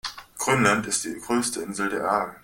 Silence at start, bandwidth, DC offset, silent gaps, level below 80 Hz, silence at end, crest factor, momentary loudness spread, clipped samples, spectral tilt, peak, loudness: 0.05 s; 17 kHz; under 0.1%; none; -58 dBFS; 0.05 s; 22 dB; 8 LU; under 0.1%; -3.5 dB/octave; -4 dBFS; -24 LUFS